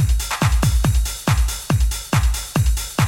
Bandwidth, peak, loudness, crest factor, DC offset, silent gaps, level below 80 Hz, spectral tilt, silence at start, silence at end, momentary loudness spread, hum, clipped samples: 17 kHz; -6 dBFS; -20 LUFS; 12 dB; under 0.1%; none; -20 dBFS; -4.5 dB/octave; 0 s; 0 s; 3 LU; none; under 0.1%